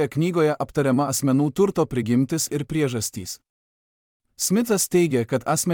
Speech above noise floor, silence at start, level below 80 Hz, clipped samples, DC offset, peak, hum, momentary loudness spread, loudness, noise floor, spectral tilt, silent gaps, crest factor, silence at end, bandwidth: over 68 dB; 0 s; -56 dBFS; under 0.1%; under 0.1%; -8 dBFS; none; 7 LU; -22 LUFS; under -90 dBFS; -5 dB/octave; 3.50-4.20 s; 14 dB; 0 s; 19 kHz